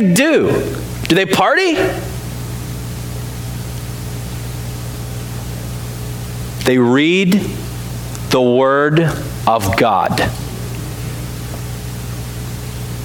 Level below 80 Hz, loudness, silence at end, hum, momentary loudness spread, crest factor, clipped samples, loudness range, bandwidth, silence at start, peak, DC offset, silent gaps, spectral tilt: -32 dBFS; -17 LUFS; 0 s; none; 13 LU; 16 dB; under 0.1%; 11 LU; 19 kHz; 0 s; 0 dBFS; under 0.1%; none; -5.5 dB/octave